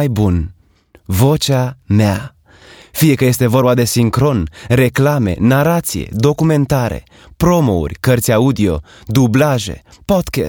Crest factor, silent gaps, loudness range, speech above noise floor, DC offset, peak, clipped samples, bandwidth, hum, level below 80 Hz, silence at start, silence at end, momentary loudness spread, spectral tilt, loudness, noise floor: 14 dB; none; 2 LU; 36 dB; under 0.1%; 0 dBFS; under 0.1%; over 20 kHz; none; -36 dBFS; 0 s; 0 s; 9 LU; -6 dB/octave; -14 LUFS; -49 dBFS